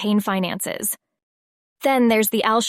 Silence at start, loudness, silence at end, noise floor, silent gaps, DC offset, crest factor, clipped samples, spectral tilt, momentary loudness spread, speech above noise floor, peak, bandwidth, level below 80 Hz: 0 s; -20 LUFS; 0 s; under -90 dBFS; 1.23-1.76 s; under 0.1%; 18 dB; under 0.1%; -4 dB/octave; 8 LU; over 70 dB; -4 dBFS; 16 kHz; -66 dBFS